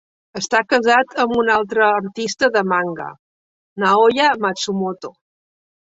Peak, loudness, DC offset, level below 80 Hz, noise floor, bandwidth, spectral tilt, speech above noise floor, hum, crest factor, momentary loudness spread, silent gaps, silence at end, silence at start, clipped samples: -2 dBFS; -17 LUFS; under 0.1%; -60 dBFS; under -90 dBFS; 8 kHz; -3.5 dB/octave; over 73 dB; none; 16 dB; 17 LU; 3.19-3.76 s; 0.85 s; 0.35 s; under 0.1%